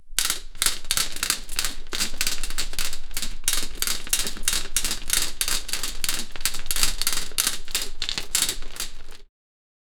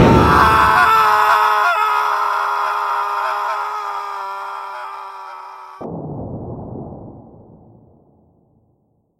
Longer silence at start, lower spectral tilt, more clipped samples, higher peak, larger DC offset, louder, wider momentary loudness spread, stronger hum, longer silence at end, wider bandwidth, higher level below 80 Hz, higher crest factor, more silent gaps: about the same, 0 s vs 0 s; second, 0.5 dB/octave vs -5.5 dB/octave; neither; about the same, 0 dBFS vs 0 dBFS; neither; second, -25 LUFS vs -15 LUFS; second, 6 LU vs 21 LU; neither; second, 0.75 s vs 2 s; first, over 20 kHz vs 16 kHz; about the same, -32 dBFS vs -36 dBFS; first, 24 dB vs 18 dB; neither